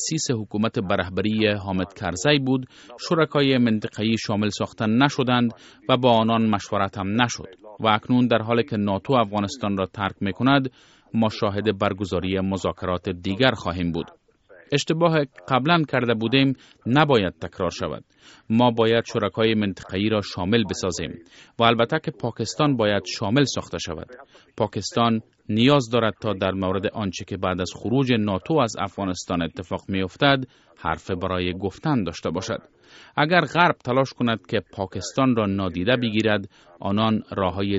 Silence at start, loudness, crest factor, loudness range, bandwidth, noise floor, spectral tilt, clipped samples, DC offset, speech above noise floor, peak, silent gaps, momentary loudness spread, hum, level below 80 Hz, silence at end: 0 s; -23 LUFS; 22 dB; 3 LU; 8 kHz; -52 dBFS; -4.5 dB/octave; under 0.1%; under 0.1%; 30 dB; 0 dBFS; none; 9 LU; none; -54 dBFS; 0 s